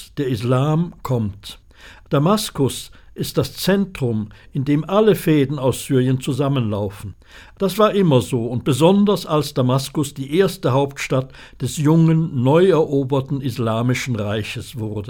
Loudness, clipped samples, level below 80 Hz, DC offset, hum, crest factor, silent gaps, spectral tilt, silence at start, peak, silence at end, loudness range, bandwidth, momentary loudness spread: -19 LUFS; under 0.1%; -46 dBFS; under 0.1%; none; 18 dB; none; -6.5 dB/octave; 0 s; -2 dBFS; 0 s; 4 LU; 18.5 kHz; 12 LU